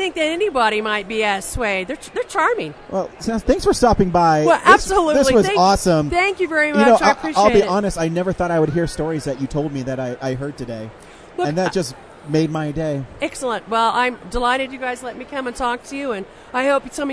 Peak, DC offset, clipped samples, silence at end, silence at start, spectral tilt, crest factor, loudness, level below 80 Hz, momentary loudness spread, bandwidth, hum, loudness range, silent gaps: 0 dBFS; under 0.1%; under 0.1%; 0 s; 0 s; -5 dB/octave; 18 dB; -18 LUFS; -38 dBFS; 12 LU; 11 kHz; none; 9 LU; none